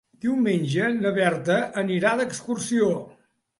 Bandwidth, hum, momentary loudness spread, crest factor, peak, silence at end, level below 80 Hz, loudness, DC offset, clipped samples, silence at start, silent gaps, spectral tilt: 11.5 kHz; none; 5 LU; 18 dB; -6 dBFS; 0.5 s; -66 dBFS; -24 LUFS; under 0.1%; under 0.1%; 0.25 s; none; -5.5 dB/octave